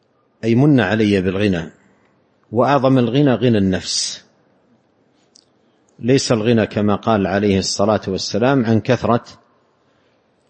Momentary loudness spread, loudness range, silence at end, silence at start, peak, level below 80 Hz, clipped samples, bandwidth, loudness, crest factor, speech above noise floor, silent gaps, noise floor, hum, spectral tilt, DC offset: 7 LU; 4 LU; 1.15 s; 0.45 s; 0 dBFS; -52 dBFS; under 0.1%; 8.8 kHz; -17 LUFS; 16 dB; 43 dB; none; -59 dBFS; none; -5.5 dB/octave; under 0.1%